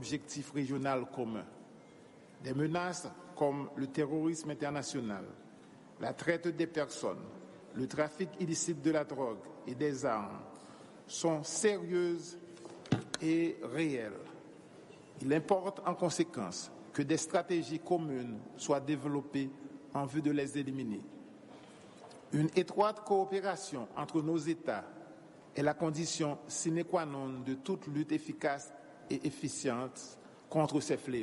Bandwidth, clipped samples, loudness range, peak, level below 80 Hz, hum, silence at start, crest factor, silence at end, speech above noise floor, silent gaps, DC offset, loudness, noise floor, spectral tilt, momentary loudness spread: 11.5 kHz; under 0.1%; 3 LU; -16 dBFS; -76 dBFS; none; 0 s; 20 dB; 0 s; 22 dB; none; under 0.1%; -36 LUFS; -57 dBFS; -5 dB/octave; 20 LU